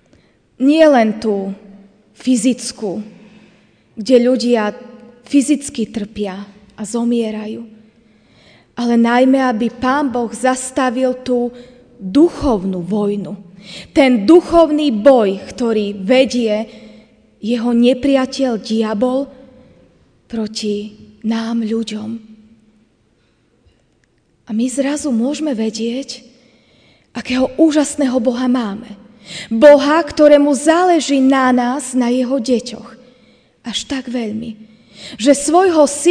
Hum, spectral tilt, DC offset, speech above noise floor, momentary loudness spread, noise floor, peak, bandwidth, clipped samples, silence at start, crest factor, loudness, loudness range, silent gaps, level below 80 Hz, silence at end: none; -4.5 dB/octave; under 0.1%; 44 dB; 19 LU; -58 dBFS; 0 dBFS; 10 kHz; 0.2%; 0.6 s; 16 dB; -15 LUFS; 10 LU; none; -48 dBFS; 0 s